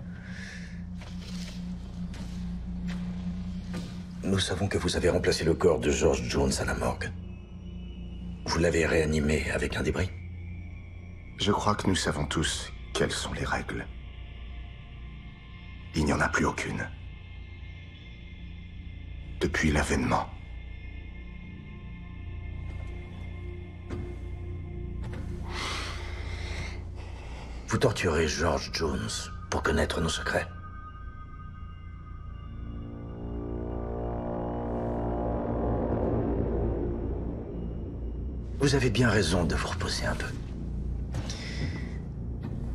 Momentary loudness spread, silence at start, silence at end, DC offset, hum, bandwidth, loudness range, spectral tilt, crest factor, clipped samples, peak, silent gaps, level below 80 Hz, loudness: 18 LU; 0 s; 0 s; under 0.1%; none; 13.5 kHz; 10 LU; -5 dB/octave; 22 dB; under 0.1%; -10 dBFS; none; -38 dBFS; -30 LUFS